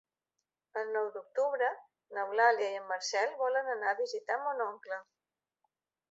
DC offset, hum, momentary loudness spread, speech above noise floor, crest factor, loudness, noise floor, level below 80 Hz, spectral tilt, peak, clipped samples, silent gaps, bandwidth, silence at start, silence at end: under 0.1%; none; 15 LU; 55 dB; 22 dB; -33 LUFS; -88 dBFS; under -90 dBFS; 2.5 dB/octave; -14 dBFS; under 0.1%; none; 7.6 kHz; 0.75 s; 1.1 s